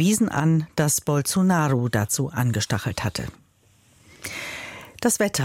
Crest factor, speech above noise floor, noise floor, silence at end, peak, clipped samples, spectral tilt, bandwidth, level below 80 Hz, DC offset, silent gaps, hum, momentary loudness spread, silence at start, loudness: 16 dB; 37 dB; -59 dBFS; 0 s; -8 dBFS; under 0.1%; -4.5 dB/octave; 16.5 kHz; -52 dBFS; under 0.1%; none; none; 13 LU; 0 s; -23 LUFS